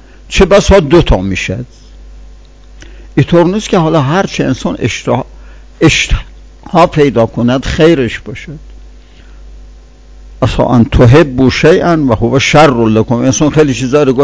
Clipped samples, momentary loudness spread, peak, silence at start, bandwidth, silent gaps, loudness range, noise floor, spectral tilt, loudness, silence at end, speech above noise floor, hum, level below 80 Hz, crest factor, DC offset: 4%; 11 LU; 0 dBFS; 0.3 s; 8 kHz; none; 6 LU; -35 dBFS; -6 dB/octave; -9 LUFS; 0 s; 26 dB; none; -24 dBFS; 10 dB; 0.3%